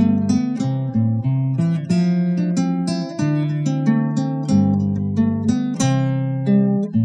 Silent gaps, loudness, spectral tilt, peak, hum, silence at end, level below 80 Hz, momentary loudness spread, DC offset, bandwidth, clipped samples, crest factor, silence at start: none; -19 LUFS; -7.5 dB/octave; -4 dBFS; none; 0 s; -56 dBFS; 4 LU; under 0.1%; 10.5 kHz; under 0.1%; 14 dB; 0 s